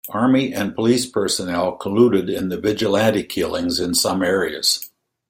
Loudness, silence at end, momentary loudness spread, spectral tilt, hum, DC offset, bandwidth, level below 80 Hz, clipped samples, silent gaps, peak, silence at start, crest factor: -19 LUFS; 0.45 s; 6 LU; -4 dB/octave; none; under 0.1%; 16.5 kHz; -54 dBFS; under 0.1%; none; -2 dBFS; 0.05 s; 16 dB